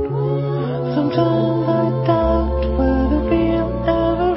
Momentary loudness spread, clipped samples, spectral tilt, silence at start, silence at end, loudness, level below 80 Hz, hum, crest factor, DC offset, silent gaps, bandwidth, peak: 3 LU; under 0.1%; -13 dB/octave; 0 s; 0 s; -18 LUFS; -26 dBFS; none; 14 dB; under 0.1%; none; 5.8 kHz; -2 dBFS